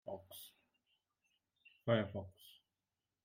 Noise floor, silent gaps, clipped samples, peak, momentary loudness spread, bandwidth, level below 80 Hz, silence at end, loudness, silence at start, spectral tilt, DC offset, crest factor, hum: under -90 dBFS; none; under 0.1%; -20 dBFS; 24 LU; 16 kHz; -84 dBFS; 0.75 s; -41 LUFS; 0.05 s; -6.5 dB/octave; under 0.1%; 26 dB; none